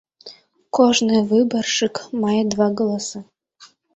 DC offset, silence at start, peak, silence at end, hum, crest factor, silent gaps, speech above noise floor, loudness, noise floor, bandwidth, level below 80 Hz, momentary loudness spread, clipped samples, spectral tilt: under 0.1%; 0.25 s; -2 dBFS; 0.3 s; none; 18 dB; none; 32 dB; -19 LUFS; -51 dBFS; 8.2 kHz; -60 dBFS; 10 LU; under 0.1%; -4 dB/octave